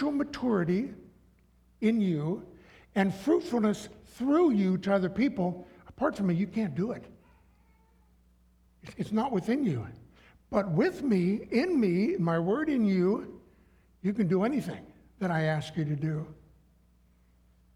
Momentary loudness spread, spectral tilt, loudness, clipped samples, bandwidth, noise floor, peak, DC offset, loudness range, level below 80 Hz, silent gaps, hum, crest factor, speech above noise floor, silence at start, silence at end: 11 LU; -8 dB/octave; -29 LUFS; under 0.1%; 12.5 kHz; -63 dBFS; -12 dBFS; under 0.1%; 7 LU; -60 dBFS; none; none; 18 dB; 35 dB; 0 s; 1.45 s